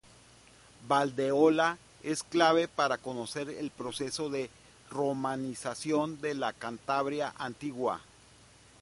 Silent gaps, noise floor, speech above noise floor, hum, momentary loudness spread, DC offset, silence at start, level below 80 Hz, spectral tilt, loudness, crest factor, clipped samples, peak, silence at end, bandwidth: none; -58 dBFS; 27 dB; none; 13 LU; under 0.1%; 0.8 s; -68 dBFS; -4.5 dB/octave; -31 LUFS; 22 dB; under 0.1%; -10 dBFS; 0.8 s; 11.5 kHz